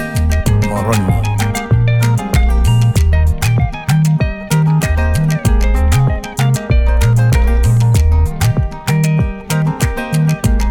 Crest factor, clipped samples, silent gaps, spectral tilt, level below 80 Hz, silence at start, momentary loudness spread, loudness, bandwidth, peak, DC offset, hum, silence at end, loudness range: 10 dB; under 0.1%; none; -6.5 dB/octave; -16 dBFS; 0 s; 5 LU; -14 LUFS; 18 kHz; -2 dBFS; under 0.1%; none; 0 s; 1 LU